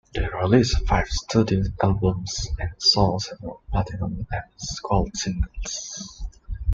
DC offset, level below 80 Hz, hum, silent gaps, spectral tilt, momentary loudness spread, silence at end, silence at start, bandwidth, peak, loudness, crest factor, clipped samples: under 0.1%; -32 dBFS; none; none; -5 dB/octave; 13 LU; 0 s; 0.15 s; 7.6 kHz; -4 dBFS; -24 LUFS; 20 dB; under 0.1%